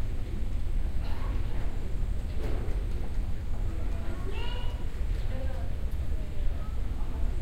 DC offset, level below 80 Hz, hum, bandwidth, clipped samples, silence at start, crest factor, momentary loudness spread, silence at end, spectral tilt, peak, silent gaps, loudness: under 0.1%; -30 dBFS; none; 8.8 kHz; under 0.1%; 0 s; 12 dB; 2 LU; 0 s; -7 dB/octave; -14 dBFS; none; -36 LUFS